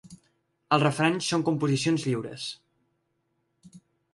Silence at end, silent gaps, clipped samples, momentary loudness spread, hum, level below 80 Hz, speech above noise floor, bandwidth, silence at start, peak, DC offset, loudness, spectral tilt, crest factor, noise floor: 0.35 s; none; under 0.1%; 12 LU; none; -68 dBFS; 50 dB; 11.5 kHz; 0.05 s; -6 dBFS; under 0.1%; -26 LUFS; -5 dB/octave; 22 dB; -75 dBFS